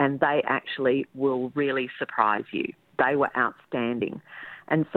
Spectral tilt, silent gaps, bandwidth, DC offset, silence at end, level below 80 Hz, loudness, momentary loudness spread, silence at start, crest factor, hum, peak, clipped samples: -8.5 dB/octave; none; 4.4 kHz; under 0.1%; 0 s; -68 dBFS; -26 LUFS; 9 LU; 0 s; 20 dB; none; -6 dBFS; under 0.1%